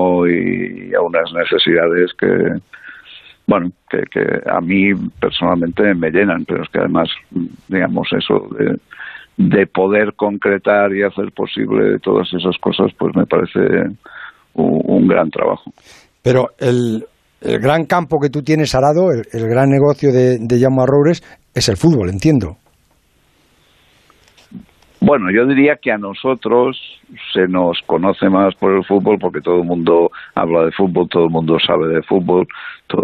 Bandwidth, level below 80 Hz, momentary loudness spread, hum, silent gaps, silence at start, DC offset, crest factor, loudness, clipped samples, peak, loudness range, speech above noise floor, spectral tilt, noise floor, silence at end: 13.5 kHz; -48 dBFS; 9 LU; none; none; 0 s; under 0.1%; 14 dB; -15 LUFS; under 0.1%; -2 dBFS; 4 LU; 42 dB; -6.5 dB/octave; -56 dBFS; 0 s